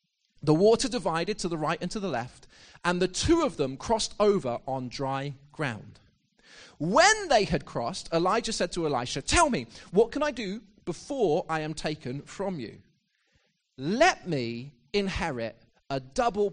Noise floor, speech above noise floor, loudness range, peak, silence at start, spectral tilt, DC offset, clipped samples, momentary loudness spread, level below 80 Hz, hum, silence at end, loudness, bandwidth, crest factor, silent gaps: -71 dBFS; 44 dB; 5 LU; -8 dBFS; 0.45 s; -4 dB/octave; under 0.1%; under 0.1%; 13 LU; -48 dBFS; none; 0 s; -27 LUFS; 10 kHz; 20 dB; none